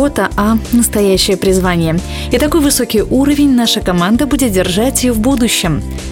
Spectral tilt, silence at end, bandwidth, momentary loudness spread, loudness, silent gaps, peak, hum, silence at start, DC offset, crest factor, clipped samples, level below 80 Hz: -4.5 dB/octave; 0 s; 17 kHz; 4 LU; -12 LUFS; none; 0 dBFS; none; 0 s; under 0.1%; 12 dB; under 0.1%; -26 dBFS